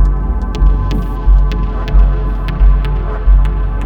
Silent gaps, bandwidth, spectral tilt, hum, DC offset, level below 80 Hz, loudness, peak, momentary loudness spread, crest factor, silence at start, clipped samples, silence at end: none; 4.6 kHz; -8.5 dB/octave; none; under 0.1%; -10 dBFS; -15 LUFS; 0 dBFS; 5 LU; 10 dB; 0 s; under 0.1%; 0 s